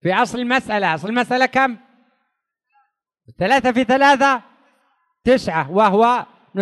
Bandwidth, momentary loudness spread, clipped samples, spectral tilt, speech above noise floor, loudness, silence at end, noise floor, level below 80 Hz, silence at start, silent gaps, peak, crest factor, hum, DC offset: 12 kHz; 10 LU; under 0.1%; -5 dB/octave; 58 dB; -17 LUFS; 0 s; -74 dBFS; -54 dBFS; 0.05 s; none; -4 dBFS; 16 dB; none; under 0.1%